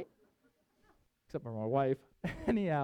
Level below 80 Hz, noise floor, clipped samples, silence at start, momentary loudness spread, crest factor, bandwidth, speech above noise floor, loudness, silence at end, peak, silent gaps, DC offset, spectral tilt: -60 dBFS; -74 dBFS; under 0.1%; 0 s; 12 LU; 18 dB; 11.5 kHz; 40 dB; -36 LUFS; 0 s; -18 dBFS; none; under 0.1%; -8.5 dB/octave